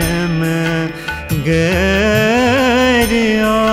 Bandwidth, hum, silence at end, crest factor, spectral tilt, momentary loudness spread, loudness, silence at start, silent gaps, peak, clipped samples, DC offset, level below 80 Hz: 16 kHz; none; 0 s; 10 dB; -5 dB/octave; 7 LU; -14 LUFS; 0 s; none; -4 dBFS; under 0.1%; under 0.1%; -30 dBFS